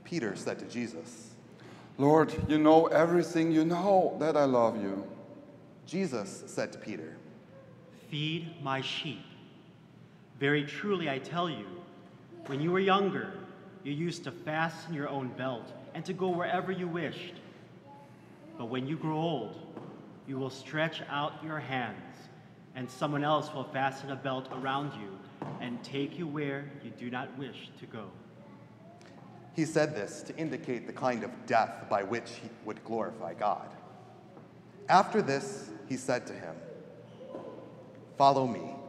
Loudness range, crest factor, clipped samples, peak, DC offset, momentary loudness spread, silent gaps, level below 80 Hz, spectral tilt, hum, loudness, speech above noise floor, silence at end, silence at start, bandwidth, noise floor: 11 LU; 24 dB; under 0.1%; -8 dBFS; under 0.1%; 25 LU; none; -68 dBFS; -6 dB/octave; none; -32 LUFS; 24 dB; 0 s; 0 s; 12.5 kHz; -55 dBFS